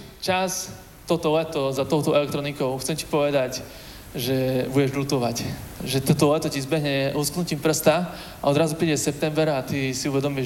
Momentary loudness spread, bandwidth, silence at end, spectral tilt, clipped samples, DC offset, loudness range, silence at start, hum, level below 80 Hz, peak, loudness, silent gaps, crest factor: 9 LU; 17 kHz; 0 s; -5 dB/octave; under 0.1%; under 0.1%; 2 LU; 0 s; none; -50 dBFS; -4 dBFS; -24 LUFS; none; 20 dB